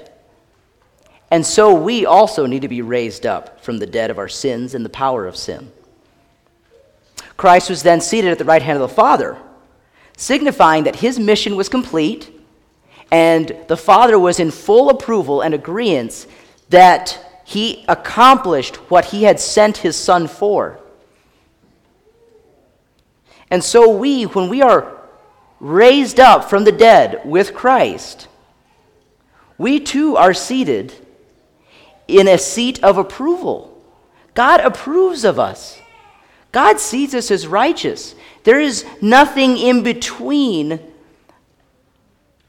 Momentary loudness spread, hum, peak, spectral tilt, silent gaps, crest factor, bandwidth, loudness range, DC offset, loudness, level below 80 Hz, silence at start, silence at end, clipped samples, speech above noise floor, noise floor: 14 LU; none; 0 dBFS; -4 dB/octave; none; 14 dB; 17.5 kHz; 7 LU; under 0.1%; -13 LUFS; -50 dBFS; 1.3 s; 1.7 s; 0.3%; 45 dB; -58 dBFS